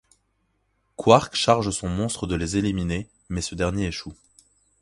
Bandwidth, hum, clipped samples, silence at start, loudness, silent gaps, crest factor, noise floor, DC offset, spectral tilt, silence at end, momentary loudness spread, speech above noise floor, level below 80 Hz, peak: 11.5 kHz; none; under 0.1%; 1 s; -23 LUFS; none; 24 dB; -70 dBFS; under 0.1%; -5 dB/octave; 0.7 s; 14 LU; 48 dB; -42 dBFS; 0 dBFS